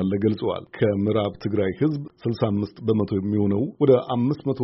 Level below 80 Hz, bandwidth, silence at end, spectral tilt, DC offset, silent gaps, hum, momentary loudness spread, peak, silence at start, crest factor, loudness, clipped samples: -56 dBFS; 5.8 kHz; 0 s; -7.5 dB/octave; under 0.1%; none; none; 7 LU; -4 dBFS; 0 s; 18 dB; -23 LUFS; under 0.1%